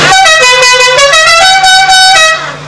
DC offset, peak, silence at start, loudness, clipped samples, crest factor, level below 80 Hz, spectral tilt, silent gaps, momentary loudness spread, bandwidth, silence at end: 2%; 0 dBFS; 0 s; -2 LUFS; 10%; 4 dB; -36 dBFS; 0.5 dB/octave; none; 1 LU; 11 kHz; 0 s